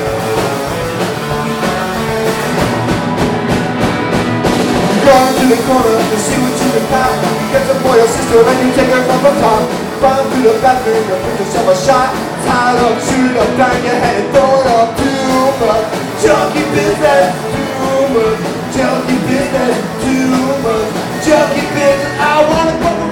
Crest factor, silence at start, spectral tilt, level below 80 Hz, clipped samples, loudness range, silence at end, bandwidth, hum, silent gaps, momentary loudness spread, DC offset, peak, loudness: 12 dB; 0 s; -5 dB/octave; -36 dBFS; under 0.1%; 3 LU; 0 s; 19 kHz; none; none; 6 LU; under 0.1%; 0 dBFS; -12 LUFS